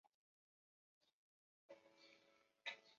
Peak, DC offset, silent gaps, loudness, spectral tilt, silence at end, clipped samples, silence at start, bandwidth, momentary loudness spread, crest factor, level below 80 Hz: -36 dBFS; under 0.1%; 0.14-1.01 s, 1.13-1.69 s; -57 LUFS; 2.5 dB/octave; 0 s; under 0.1%; 0.05 s; 7.2 kHz; 16 LU; 28 dB; under -90 dBFS